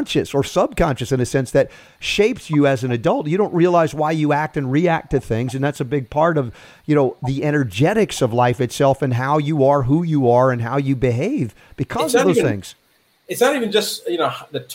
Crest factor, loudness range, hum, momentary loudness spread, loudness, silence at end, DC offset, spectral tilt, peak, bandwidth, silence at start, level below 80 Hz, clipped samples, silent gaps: 14 dB; 3 LU; none; 7 LU; -18 LUFS; 0 s; under 0.1%; -6 dB/octave; -4 dBFS; 16 kHz; 0 s; -44 dBFS; under 0.1%; none